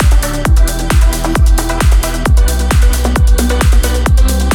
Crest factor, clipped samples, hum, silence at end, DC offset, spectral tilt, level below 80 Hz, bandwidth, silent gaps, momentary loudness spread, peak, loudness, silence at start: 8 dB; under 0.1%; none; 0 s; under 0.1%; -5 dB/octave; -10 dBFS; 17.5 kHz; none; 1 LU; 0 dBFS; -12 LUFS; 0 s